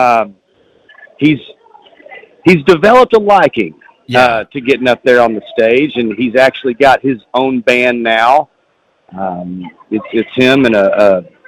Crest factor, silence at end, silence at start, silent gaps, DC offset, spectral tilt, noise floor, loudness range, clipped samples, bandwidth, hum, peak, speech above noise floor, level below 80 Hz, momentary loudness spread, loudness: 12 dB; 0.25 s; 0 s; none; under 0.1%; -6 dB/octave; -57 dBFS; 3 LU; 0.4%; 15.5 kHz; none; 0 dBFS; 46 dB; -48 dBFS; 13 LU; -11 LUFS